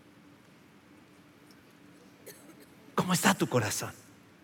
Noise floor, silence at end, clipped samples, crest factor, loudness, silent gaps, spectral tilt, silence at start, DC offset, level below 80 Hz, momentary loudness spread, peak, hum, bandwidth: -58 dBFS; 0.45 s; under 0.1%; 28 dB; -29 LUFS; none; -4 dB/octave; 2.25 s; under 0.1%; -76 dBFS; 26 LU; -6 dBFS; none; 17 kHz